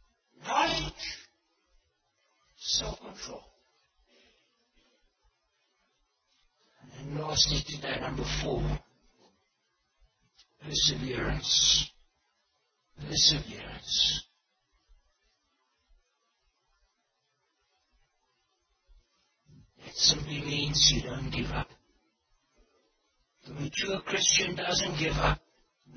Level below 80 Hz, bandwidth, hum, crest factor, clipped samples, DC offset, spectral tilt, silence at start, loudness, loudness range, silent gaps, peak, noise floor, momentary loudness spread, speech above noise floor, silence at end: -46 dBFS; 6.6 kHz; none; 26 dB; under 0.1%; under 0.1%; -2 dB/octave; 0.4 s; -27 LUFS; 11 LU; none; -8 dBFS; -78 dBFS; 19 LU; 49 dB; 0 s